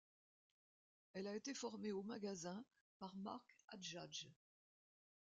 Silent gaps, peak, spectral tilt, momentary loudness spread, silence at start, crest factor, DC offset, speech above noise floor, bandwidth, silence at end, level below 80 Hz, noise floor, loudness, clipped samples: 2.81-3.00 s; -36 dBFS; -4 dB/octave; 10 LU; 1.15 s; 16 dB; under 0.1%; over 39 dB; 9 kHz; 1.05 s; under -90 dBFS; under -90 dBFS; -51 LUFS; under 0.1%